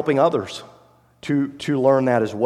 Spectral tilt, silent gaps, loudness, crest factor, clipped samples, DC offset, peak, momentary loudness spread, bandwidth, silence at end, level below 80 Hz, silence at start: -6.5 dB/octave; none; -20 LUFS; 16 dB; under 0.1%; under 0.1%; -4 dBFS; 16 LU; 12 kHz; 0 s; -64 dBFS; 0 s